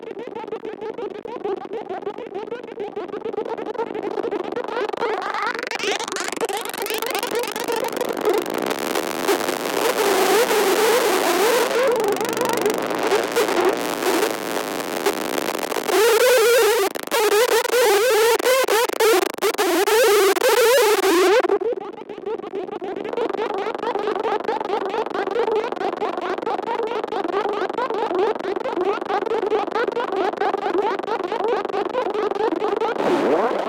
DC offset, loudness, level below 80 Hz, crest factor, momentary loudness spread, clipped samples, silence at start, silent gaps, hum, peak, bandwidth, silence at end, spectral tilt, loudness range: under 0.1%; -21 LUFS; -64 dBFS; 18 dB; 13 LU; under 0.1%; 0 s; none; none; -4 dBFS; 17.5 kHz; 0 s; -2 dB/octave; 9 LU